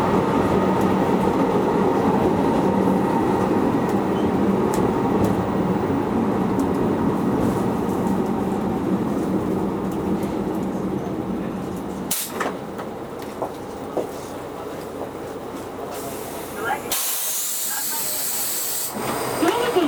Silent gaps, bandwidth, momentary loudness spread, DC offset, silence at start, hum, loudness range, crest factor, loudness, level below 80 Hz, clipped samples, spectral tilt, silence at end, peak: none; over 20 kHz; 12 LU; under 0.1%; 0 s; none; 10 LU; 16 dB; -22 LUFS; -46 dBFS; under 0.1%; -5 dB/octave; 0 s; -6 dBFS